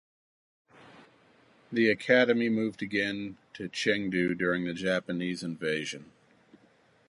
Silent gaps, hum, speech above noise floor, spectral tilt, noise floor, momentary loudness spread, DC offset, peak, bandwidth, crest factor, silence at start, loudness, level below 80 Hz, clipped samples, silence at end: none; none; 35 dB; -5 dB/octave; -64 dBFS; 15 LU; under 0.1%; -10 dBFS; 11.5 kHz; 22 dB; 1 s; -29 LUFS; -68 dBFS; under 0.1%; 1.05 s